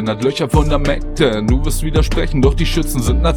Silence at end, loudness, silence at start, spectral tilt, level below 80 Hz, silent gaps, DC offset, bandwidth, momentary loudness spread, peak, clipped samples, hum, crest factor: 0 s; -16 LUFS; 0 s; -6 dB/octave; -18 dBFS; none; under 0.1%; 18.5 kHz; 3 LU; 0 dBFS; under 0.1%; none; 14 dB